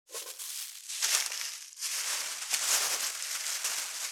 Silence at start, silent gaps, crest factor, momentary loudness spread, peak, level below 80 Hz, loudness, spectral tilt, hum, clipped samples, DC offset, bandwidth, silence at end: 0.1 s; none; 30 dB; 11 LU; -4 dBFS; under -90 dBFS; -31 LUFS; 4.5 dB/octave; none; under 0.1%; under 0.1%; over 20 kHz; 0 s